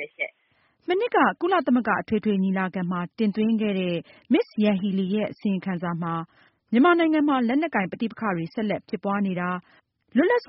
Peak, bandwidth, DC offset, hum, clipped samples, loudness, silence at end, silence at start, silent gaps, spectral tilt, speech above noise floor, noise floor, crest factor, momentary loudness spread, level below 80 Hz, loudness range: -8 dBFS; 5.8 kHz; under 0.1%; none; under 0.1%; -24 LUFS; 0.05 s; 0 s; none; -5.5 dB/octave; 43 dB; -66 dBFS; 16 dB; 9 LU; -66 dBFS; 2 LU